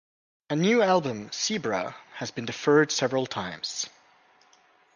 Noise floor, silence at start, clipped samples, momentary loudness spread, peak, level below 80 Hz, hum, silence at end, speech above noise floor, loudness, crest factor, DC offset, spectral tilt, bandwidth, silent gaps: -61 dBFS; 0.5 s; under 0.1%; 13 LU; -8 dBFS; -68 dBFS; none; 1.1 s; 35 dB; -26 LUFS; 20 dB; under 0.1%; -4 dB/octave; 10 kHz; none